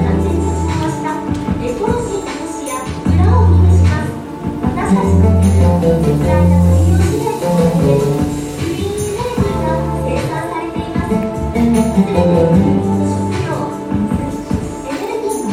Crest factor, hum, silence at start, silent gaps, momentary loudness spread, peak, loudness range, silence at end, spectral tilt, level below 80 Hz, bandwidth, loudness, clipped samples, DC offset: 12 dB; none; 0 s; none; 10 LU; -2 dBFS; 5 LU; 0 s; -7.5 dB/octave; -30 dBFS; 15.5 kHz; -15 LUFS; under 0.1%; under 0.1%